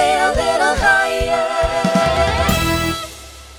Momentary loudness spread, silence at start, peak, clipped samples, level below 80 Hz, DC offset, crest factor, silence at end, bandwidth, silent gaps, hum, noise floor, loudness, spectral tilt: 8 LU; 0 s; -2 dBFS; under 0.1%; -28 dBFS; under 0.1%; 14 dB; 0 s; over 20 kHz; none; none; -36 dBFS; -16 LUFS; -4 dB/octave